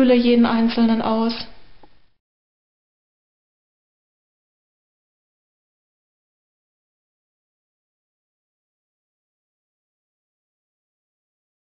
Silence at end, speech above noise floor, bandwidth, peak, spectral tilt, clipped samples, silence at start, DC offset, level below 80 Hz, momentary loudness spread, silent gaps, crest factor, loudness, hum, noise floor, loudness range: 9.45 s; 31 dB; 5.6 kHz; -6 dBFS; -4 dB/octave; under 0.1%; 0 s; 2%; -56 dBFS; 13 LU; none; 20 dB; -18 LUFS; none; -48 dBFS; 16 LU